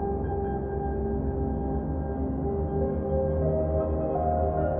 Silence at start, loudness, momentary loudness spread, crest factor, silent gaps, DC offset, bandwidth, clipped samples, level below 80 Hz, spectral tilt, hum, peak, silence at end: 0 s; -28 LUFS; 4 LU; 12 dB; none; under 0.1%; 2.6 kHz; under 0.1%; -34 dBFS; -11.5 dB/octave; none; -14 dBFS; 0 s